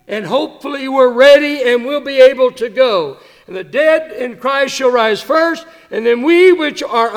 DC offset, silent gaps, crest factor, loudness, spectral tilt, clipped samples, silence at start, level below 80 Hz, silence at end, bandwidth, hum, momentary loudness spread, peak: under 0.1%; none; 12 dB; -12 LUFS; -3.5 dB/octave; 0.3%; 0.1 s; -58 dBFS; 0 s; 15 kHz; none; 14 LU; 0 dBFS